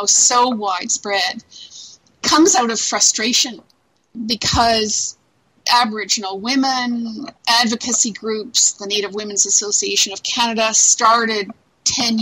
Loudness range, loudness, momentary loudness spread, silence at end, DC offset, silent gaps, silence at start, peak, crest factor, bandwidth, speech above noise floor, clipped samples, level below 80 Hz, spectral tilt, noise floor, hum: 3 LU; -16 LUFS; 12 LU; 0 s; under 0.1%; none; 0 s; -2 dBFS; 16 dB; 16 kHz; 24 dB; under 0.1%; -46 dBFS; -1 dB/octave; -41 dBFS; none